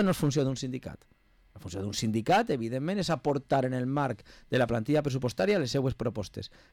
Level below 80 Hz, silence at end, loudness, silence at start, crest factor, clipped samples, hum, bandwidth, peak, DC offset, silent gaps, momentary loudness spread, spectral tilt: -56 dBFS; 0.25 s; -29 LUFS; 0 s; 12 dB; under 0.1%; none; 17 kHz; -16 dBFS; under 0.1%; none; 14 LU; -6 dB/octave